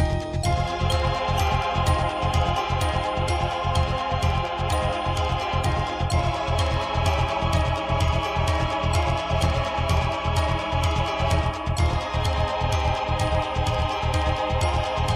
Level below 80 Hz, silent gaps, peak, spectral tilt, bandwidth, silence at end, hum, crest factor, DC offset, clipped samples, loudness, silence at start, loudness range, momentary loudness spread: -30 dBFS; none; -8 dBFS; -5.5 dB/octave; 15.5 kHz; 0 s; none; 14 dB; under 0.1%; under 0.1%; -24 LUFS; 0 s; 1 LU; 2 LU